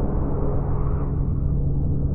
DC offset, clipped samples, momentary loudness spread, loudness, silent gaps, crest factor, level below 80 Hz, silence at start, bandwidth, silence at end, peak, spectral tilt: under 0.1%; under 0.1%; 1 LU; -25 LUFS; none; 12 dB; -24 dBFS; 0 s; 2.4 kHz; 0 s; -10 dBFS; -14 dB/octave